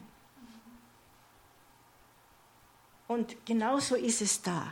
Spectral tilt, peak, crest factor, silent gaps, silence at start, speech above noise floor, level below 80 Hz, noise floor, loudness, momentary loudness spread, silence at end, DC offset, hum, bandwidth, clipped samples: -3.5 dB/octave; -14 dBFS; 22 dB; none; 0 s; 31 dB; -72 dBFS; -62 dBFS; -31 LUFS; 25 LU; 0 s; under 0.1%; none; 17 kHz; under 0.1%